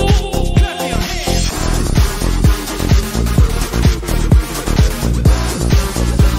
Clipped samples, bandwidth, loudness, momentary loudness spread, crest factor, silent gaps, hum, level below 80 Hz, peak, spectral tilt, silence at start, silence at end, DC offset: under 0.1%; 16.5 kHz; -15 LUFS; 3 LU; 12 dB; none; none; -16 dBFS; -2 dBFS; -5 dB/octave; 0 s; 0 s; under 0.1%